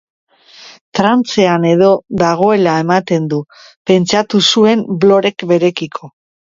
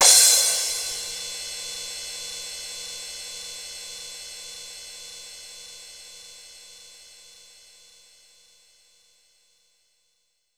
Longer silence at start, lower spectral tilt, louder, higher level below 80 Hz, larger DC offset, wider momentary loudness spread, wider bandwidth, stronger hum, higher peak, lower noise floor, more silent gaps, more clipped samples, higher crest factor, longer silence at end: first, 0.6 s vs 0 s; first, -5.5 dB/octave vs 3 dB/octave; first, -12 LUFS vs -23 LUFS; first, -54 dBFS vs -66 dBFS; neither; second, 11 LU vs 24 LU; second, 7.8 kHz vs over 20 kHz; neither; about the same, 0 dBFS vs 0 dBFS; second, -39 dBFS vs -72 dBFS; first, 0.81-0.92 s, 3.76-3.85 s vs none; neither; second, 12 dB vs 28 dB; second, 0.4 s vs 3.3 s